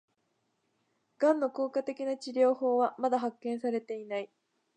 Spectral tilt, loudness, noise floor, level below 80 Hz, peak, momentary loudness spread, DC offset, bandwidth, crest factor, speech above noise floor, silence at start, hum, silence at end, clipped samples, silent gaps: -5 dB/octave; -31 LUFS; -78 dBFS; -90 dBFS; -14 dBFS; 10 LU; under 0.1%; 9.4 kHz; 18 dB; 48 dB; 1.2 s; none; 0.5 s; under 0.1%; none